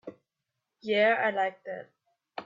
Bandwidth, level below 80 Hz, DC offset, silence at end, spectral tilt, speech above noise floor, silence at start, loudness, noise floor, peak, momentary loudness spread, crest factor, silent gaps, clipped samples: 7.4 kHz; -84 dBFS; under 0.1%; 0 s; -5.5 dB/octave; 58 dB; 0.05 s; -27 LUFS; -85 dBFS; -12 dBFS; 20 LU; 18 dB; none; under 0.1%